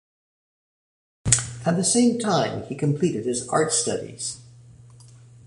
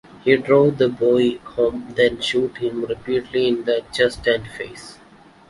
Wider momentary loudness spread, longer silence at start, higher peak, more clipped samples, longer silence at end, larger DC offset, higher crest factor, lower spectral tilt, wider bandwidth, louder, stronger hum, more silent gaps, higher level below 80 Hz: about the same, 12 LU vs 10 LU; first, 1.25 s vs 0.25 s; about the same, -2 dBFS vs -2 dBFS; neither; second, 0.3 s vs 0.55 s; neither; first, 24 dB vs 18 dB; second, -4 dB/octave vs -5.5 dB/octave; about the same, 11.5 kHz vs 11.5 kHz; second, -23 LUFS vs -19 LUFS; neither; neither; about the same, -50 dBFS vs -50 dBFS